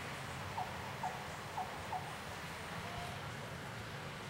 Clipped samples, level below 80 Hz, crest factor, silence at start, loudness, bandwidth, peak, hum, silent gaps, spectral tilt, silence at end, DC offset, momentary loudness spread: under 0.1%; -62 dBFS; 16 dB; 0 s; -44 LUFS; 16 kHz; -28 dBFS; none; none; -4 dB/octave; 0 s; under 0.1%; 3 LU